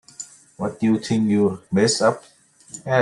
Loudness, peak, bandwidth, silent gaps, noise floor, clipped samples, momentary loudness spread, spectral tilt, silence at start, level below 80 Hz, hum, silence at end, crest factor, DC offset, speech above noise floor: -20 LUFS; -4 dBFS; 11.5 kHz; none; -43 dBFS; under 0.1%; 19 LU; -5 dB/octave; 0.2 s; -62 dBFS; none; 0 s; 18 dB; under 0.1%; 23 dB